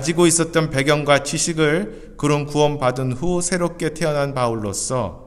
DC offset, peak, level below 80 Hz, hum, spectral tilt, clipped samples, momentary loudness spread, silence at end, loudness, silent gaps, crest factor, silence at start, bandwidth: under 0.1%; -2 dBFS; -40 dBFS; none; -4.5 dB/octave; under 0.1%; 8 LU; 0 s; -19 LUFS; none; 18 dB; 0 s; 14.5 kHz